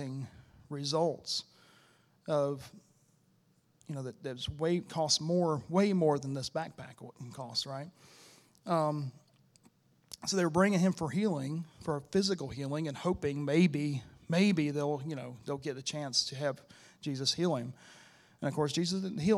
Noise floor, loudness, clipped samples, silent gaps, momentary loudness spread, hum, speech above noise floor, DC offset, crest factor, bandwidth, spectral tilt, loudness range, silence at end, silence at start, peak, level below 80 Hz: -70 dBFS; -33 LUFS; under 0.1%; none; 16 LU; none; 37 dB; under 0.1%; 22 dB; 13.5 kHz; -5 dB/octave; 6 LU; 0 s; 0 s; -12 dBFS; -64 dBFS